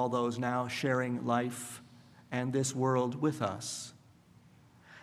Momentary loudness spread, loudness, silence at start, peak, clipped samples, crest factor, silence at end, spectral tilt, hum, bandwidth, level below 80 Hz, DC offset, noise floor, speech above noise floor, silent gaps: 12 LU; -33 LUFS; 0 s; -16 dBFS; under 0.1%; 18 dB; 0 s; -5 dB/octave; none; 15.5 kHz; -74 dBFS; under 0.1%; -60 dBFS; 28 dB; none